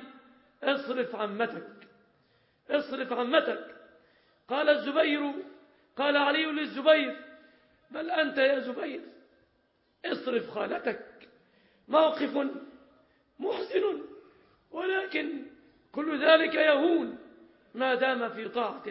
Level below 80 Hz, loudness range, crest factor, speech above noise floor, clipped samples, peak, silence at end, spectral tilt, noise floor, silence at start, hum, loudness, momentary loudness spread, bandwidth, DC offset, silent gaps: -80 dBFS; 7 LU; 22 dB; 43 dB; under 0.1%; -10 dBFS; 0 s; -7.5 dB/octave; -71 dBFS; 0 s; none; -28 LUFS; 18 LU; 5.8 kHz; under 0.1%; none